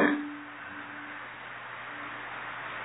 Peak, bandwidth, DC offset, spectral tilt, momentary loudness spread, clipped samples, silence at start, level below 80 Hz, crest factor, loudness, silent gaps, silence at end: -10 dBFS; 4 kHz; under 0.1%; -2.5 dB/octave; 6 LU; under 0.1%; 0 s; -74 dBFS; 26 dB; -37 LUFS; none; 0 s